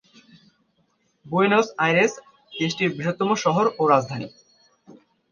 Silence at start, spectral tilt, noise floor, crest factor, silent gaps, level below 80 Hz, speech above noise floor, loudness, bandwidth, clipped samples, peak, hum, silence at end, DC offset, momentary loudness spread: 1.25 s; -5 dB/octave; -67 dBFS; 20 dB; none; -68 dBFS; 46 dB; -21 LUFS; 7.2 kHz; under 0.1%; -4 dBFS; none; 0.4 s; under 0.1%; 14 LU